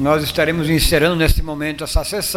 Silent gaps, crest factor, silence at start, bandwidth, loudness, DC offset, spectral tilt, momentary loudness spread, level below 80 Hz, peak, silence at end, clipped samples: none; 16 dB; 0 s; 16.5 kHz; -17 LUFS; under 0.1%; -4.5 dB/octave; 7 LU; -24 dBFS; -2 dBFS; 0 s; under 0.1%